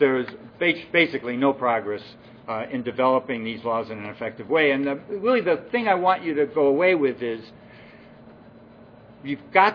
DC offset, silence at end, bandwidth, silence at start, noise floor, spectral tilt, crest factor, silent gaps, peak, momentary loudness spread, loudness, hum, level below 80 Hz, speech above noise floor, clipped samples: under 0.1%; 0 s; 5.4 kHz; 0 s; -48 dBFS; -7.5 dB/octave; 22 dB; none; -2 dBFS; 13 LU; -23 LUFS; none; -66 dBFS; 25 dB; under 0.1%